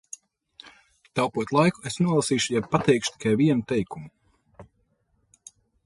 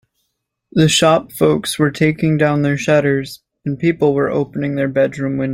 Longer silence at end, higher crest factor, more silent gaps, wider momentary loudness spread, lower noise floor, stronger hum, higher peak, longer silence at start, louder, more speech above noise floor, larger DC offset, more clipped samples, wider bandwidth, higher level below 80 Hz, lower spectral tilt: first, 1.2 s vs 0 s; first, 20 dB vs 14 dB; neither; first, 13 LU vs 8 LU; second, -69 dBFS vs -73 dBFS; neither; second, -6 dBFS vs -2 dBFS; first, 1.15 s vs 0.75 s; second, -24 LUFS vs -16 LUFS; second, 46 dB vs 57 dB; neither; neither; second, 11.5 kHz vs 16.5 kHz; second, -58 dBFS vs -50 dBFS; about the same, -5 dB/octave vs -5.5 dB/octave